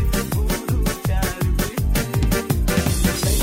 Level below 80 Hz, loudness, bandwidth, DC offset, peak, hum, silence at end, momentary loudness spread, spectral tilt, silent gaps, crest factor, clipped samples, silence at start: -24 dBFS; -21 LUFS; 16.5 kHz; under 0.1%; -6 dBFS; none; 0 s; 3 LU; -5 dB/octave; none; 14 dB; under 0.1%; 0 s